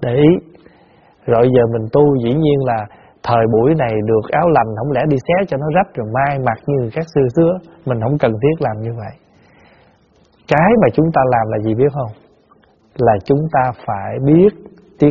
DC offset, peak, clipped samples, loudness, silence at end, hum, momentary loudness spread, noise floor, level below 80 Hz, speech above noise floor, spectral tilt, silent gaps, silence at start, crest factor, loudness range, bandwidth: under 0.1%; 0 dBFS; under 0.1%; -15 LUFS; 0 s; none; 10 LU; -53 dBFS; -44 dBFS; 38 dB; -7.5 dB/octave; none; 0 s; 16 dB; 3 LU; 7 kHz